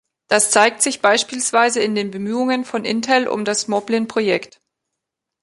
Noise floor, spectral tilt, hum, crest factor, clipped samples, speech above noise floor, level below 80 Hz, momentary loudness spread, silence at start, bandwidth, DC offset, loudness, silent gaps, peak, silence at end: -81 dBFS; -2.5 dB/octave; none; 18 dB; under 0.1%; 63 dB; -66 dBFS; 8 LU; 0.3 s; 12 kHz; under 0.1%; -18 LUFS; none; 0 dBFS; 0.95 s